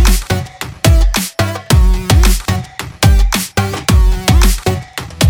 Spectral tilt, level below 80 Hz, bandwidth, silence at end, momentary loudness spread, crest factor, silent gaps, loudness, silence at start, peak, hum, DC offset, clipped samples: -4.5 dB/octave; -14 dBFS; over 20 kHz; 0 s; 8 LU; 12 dB; none; -13 LUFS; 0 s; 0 dBFS; none; under 0.1%; under 0.1%